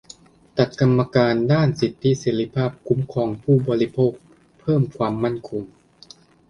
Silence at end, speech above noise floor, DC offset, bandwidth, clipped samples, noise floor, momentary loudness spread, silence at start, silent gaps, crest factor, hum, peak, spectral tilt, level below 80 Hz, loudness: 0.85 s; 29 dB; under 0.1%; 7.4 kHz; under 0.1%; -49 dBFS; 10 LU; 0.55 s; none; 20 dB; none; -2 dBFS; -7.5 dB/octave; -52 dBFS; -21 LUFS